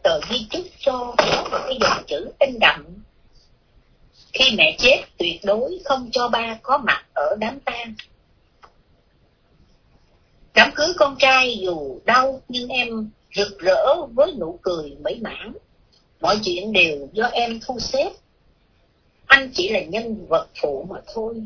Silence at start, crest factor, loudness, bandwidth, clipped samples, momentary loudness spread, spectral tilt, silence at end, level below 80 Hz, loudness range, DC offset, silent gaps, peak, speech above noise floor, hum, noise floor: 0.05 s; 22 dB; -19 LUFS; 5.4 kHz; under 0.1%; 15 LU; -3 dB/octave; 0 s; -50 dBFS; 5 LU; under 0.1%; none; 0 dBFS; 39 dB; none; -60 dBFS